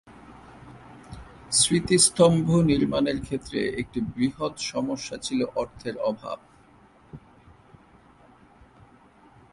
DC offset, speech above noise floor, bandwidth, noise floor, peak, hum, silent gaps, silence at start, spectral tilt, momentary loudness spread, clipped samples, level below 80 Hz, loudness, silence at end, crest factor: under 0.1%; 31 dB; 11.5 kHz; -55 dBFS; -4 dBFS; none; none; 0.1 s; -4 dB/octave; 17 LU; under 0.1%; -52 dBFS; -24 LUFS; 2.35 s; 22 dB